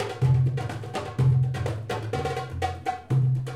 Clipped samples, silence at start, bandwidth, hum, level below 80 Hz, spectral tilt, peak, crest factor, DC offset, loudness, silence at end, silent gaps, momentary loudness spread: under 0.1%; 0 s; 10.5 kHz; none; -52 dBFS; -7.5 dB/octave; -12 dBFS; 14 dB; 0.1%; -26 LUFS; 0 s; none; 10 LU